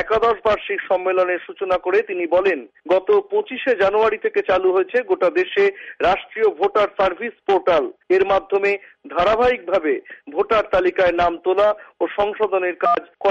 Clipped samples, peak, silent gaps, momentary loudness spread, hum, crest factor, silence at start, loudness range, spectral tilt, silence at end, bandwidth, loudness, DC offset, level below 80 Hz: under 0.1%; -6 dBFS; none; 5 LU; none; 12 dB; 0 s; 1 LU; -5.5 dB/octave; 0 s; 7.2 kHz; -19 LUFS; under 0.1%; -50 dBFS